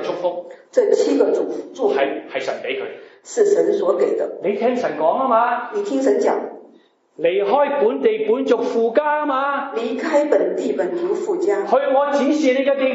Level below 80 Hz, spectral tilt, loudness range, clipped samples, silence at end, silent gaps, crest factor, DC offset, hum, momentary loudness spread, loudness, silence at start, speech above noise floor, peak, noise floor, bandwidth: -84 dBFS; -4.5 dB/octave; 2 LU; under 0.1%; 0 s; none; 16 dB; under 0.1%; none; 8 LU; -19 LUFS; 0 s; 34 dB; -2 dBFS; -52 dBFS; 8 kHz